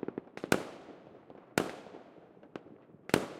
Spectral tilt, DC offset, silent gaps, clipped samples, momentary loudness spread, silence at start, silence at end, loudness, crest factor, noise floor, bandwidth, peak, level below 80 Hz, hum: -4.5 dB/octave; under 0.1%; none; under 0.1%; 22 LU; 0 s; 0 s; -36 LUFS; 32 dB; -57 dBFS; 16 kHz; -6 dBFS; -70 dBFS; none